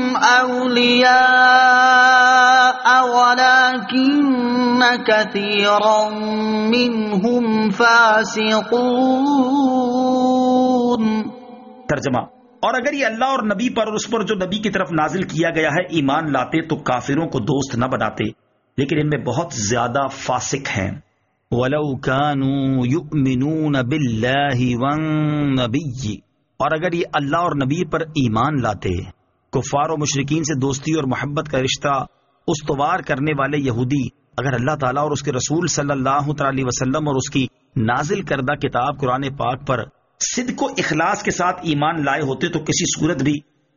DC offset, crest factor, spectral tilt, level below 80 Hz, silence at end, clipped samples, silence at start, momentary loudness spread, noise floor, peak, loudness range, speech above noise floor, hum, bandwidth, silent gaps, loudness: under 0.1%; 16 dB; -3.5 dB/octave; -48 dBFS; 0.35 s; under 0.1%; 0 s; 11 LU; -39 dBFS; -2 dBFS; 8 LU; 21 dB; none; 7.4 kHz; none; -18 LUFS